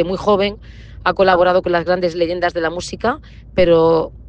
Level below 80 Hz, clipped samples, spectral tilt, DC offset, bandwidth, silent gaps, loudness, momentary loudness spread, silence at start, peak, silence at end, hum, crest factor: -38 dBFS; under 0.1%; -5.5 dB/octave; under 0.1%; 9 kHz; none; -16 LUFS; 9 LU; 0 s; 0 dBFS; 0 s; none; 16 dB